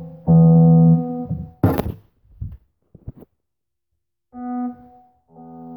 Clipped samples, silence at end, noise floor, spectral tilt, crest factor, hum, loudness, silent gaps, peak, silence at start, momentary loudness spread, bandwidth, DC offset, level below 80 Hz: under 0.1%; 0 s; -84 dBFS; -11.5 dB/octave; 16 dB; none; -16 LUFS; none; -4 dBFS; 0 s; 25 LU; 18 kHz; under 0.1%; -42 dBFS